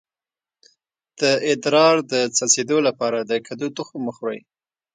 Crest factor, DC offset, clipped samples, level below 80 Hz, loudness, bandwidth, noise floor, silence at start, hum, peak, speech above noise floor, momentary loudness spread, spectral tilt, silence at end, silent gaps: 20 dB; under 0.1%; under 0.1%; -72 dBFS; -20 LUFS; 9.6 kHz; under -90 dBFS; 1.2 s; none; -2 dBFS; over 70 dB; 13 LU; -2.5 dB/octave; 0.55 s; none